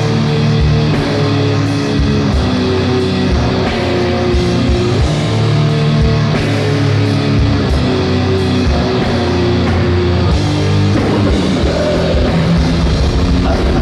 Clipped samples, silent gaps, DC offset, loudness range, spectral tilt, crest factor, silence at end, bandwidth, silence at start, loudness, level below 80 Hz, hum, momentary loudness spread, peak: under 0.1%; none; under 0.1%; 1 LU; -7 dB/octave; 10 dB; 0 s; 11.5 kHz; 0 s; -13 LUFS; -22 dBFS; none; 2 LU; -2 dBFS